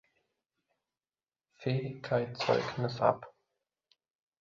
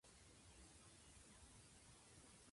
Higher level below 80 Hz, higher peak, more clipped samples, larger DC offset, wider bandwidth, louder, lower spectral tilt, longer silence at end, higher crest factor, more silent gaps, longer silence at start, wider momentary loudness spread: about the same, -70 dBFS vs -74 dBFS; first, -10 dBFS vs -52 dBFS; neither; neither; second, 7.4 kHz vs 11.5 kHz; first, -33 LUFS vs -65 LUFS; first, -5 dB/octave vs -3 dB/octave; first, 1.1 s vs 0 s; first, 26 dB vs 14 dB; neither; first, 1.6 s vs 0.05 s; first, 7 LU vs 1 LU